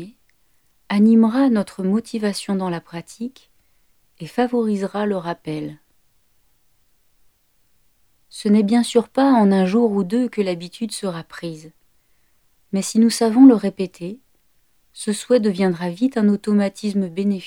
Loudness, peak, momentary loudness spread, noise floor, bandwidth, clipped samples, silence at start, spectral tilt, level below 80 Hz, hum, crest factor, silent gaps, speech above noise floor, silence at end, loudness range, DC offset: -19 LUFS; -2 dBFS; 18 LU; -63 dBFS; 15.5 kHz; under 0.1%; 0 s; -6 dB/octave; -66 dBFS; none; 18 dB; none; 45 dB; 0 s; 7 LU; under 0.1%